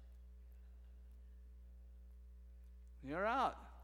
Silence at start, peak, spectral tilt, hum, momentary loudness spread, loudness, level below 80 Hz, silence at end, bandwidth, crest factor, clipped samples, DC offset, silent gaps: 0 s; -26 dBFS; -6 dB/octave; 60 Hz at -60 dBFS; 22 LU; -40 LUFS; -58 dBFS; 0 s; 18 kHz; 22 dB; under 0.1%; under 0.1%; none